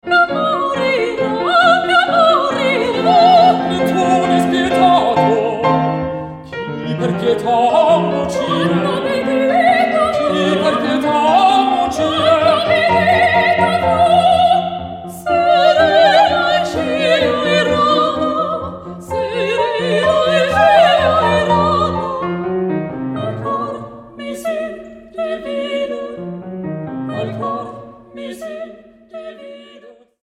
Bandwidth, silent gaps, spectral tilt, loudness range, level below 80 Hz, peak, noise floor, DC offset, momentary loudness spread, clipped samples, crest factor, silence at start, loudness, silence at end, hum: 14.5 kHz; none; -5.5 dB/octave; 11 LU; -46 dBFS; 0 dBFS; -42 dBFS; under 0.1%; 16 LU; under 0.1%; 14 dB; 0.05 s; -14 LUFS; 0.35 s; none